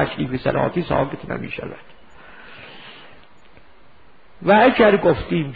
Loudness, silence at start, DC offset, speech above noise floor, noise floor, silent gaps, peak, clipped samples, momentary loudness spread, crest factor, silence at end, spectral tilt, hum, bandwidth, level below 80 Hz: -18 LUFS; 0 s; 0.7%; 34 dB; -52 dBFS; none; -2 dBFS; under 0.1%; 26 LU; 18 dB; 0 s; -9.5 dB/octave; none; 5 kHz; -46 dBFS